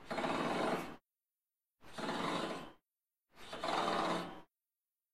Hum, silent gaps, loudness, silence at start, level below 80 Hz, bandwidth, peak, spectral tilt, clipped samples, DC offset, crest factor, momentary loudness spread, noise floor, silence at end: none; none; -39 LUFS; 0 s; -70 dBFS; 14.5 kHz; -22 dBFS; -4.5 dB/octave; under 0.1%; under 0.1%; 18 dB; 19 LU; under -90 dBFS; 0 s